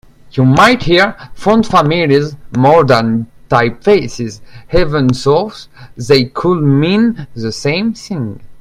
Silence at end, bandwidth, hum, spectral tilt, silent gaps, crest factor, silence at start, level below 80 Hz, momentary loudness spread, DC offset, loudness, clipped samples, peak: 0 s; 14.5 kHz; none; -6.5 dB/octave; none; 12 dB; 0.25 s; -34 dBFS; 13 LU; under 0.1%; -12 LUFS; 0.1%; 0 dBFS